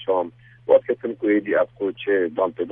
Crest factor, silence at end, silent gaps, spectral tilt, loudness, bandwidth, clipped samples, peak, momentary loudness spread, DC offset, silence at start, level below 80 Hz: 18 dB; 0 s; none; -9 dB/octave; -22 LUFS; 3.7 kHz; under 0.1%; -4 dBFS; 8 LU; under 0.1%; 0 s; -66 dBFS